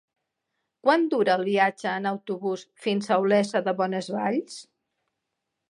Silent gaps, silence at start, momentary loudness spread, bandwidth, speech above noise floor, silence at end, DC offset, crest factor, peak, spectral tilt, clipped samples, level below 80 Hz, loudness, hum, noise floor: none; 0.85 s; 9 LU; 11.5 kHz; 58 dB; 1.1 s; under 0.1%; 20 dB; -6 dBFS; -5.5 dB/octave; under 0.1%; -80 dBFS; -25 LUFS; none; -82 dBFS